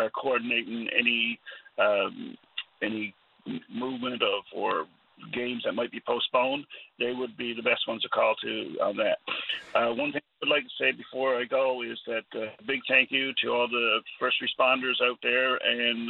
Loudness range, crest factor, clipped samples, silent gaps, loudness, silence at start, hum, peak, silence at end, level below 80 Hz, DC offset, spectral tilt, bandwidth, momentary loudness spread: 6 LU; 22 dB; under 0.1%; none; -27 LUFS; 0 s; none; -8 dBFS; 0 s; -78 dBFS; under 0.1%; -5.5 dB/octave; 5.2 kHz; 11 LU